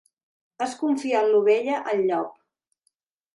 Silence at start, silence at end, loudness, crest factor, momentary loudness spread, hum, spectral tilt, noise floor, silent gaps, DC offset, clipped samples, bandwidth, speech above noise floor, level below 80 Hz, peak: 0.6 s; 1.05 s; -23 LUFS; 16 dB; 11 LU; none; -5 dB/octave; -74 dBFS; none; under 0.1%; under 0.1%; 11.5 kHz; 51 dB; -78 dBFS; -10 dBFS